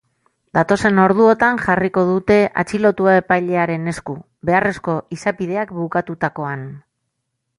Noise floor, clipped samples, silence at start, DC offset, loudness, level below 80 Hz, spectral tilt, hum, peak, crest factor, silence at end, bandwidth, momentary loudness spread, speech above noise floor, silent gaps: -75 dBFS; under 0.1%; 0.55 s; under 0.1%; -17 LUFS; -50 dBFS; -7 dB/octave; none; 0 dBFS; 18 dB; 0.8 s; 11.5 kHz; 12 LU; 58 dB; none